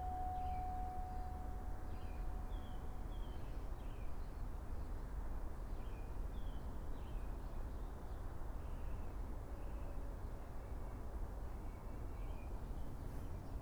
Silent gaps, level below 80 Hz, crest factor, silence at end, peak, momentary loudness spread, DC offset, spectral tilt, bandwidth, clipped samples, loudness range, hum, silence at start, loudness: none; -46 dBFS; 12 dB; 0 s; -32 dBFS; 5 LU; under 0.1%; -7 dB/octave; over 20 kHz; under 0.1%; 2 LU; none; 0 s; -50 LUFS